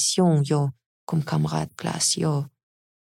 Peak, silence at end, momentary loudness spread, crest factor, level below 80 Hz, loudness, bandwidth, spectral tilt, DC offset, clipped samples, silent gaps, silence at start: -10 dBFS; 0.55 s; 9 LU; 14 dB; -62 dBFS; -24 LUFS; 15 kHz; -4.5 dB/octave; under 0.1%; under 0.1%; 0.86-1.07 s; 0 s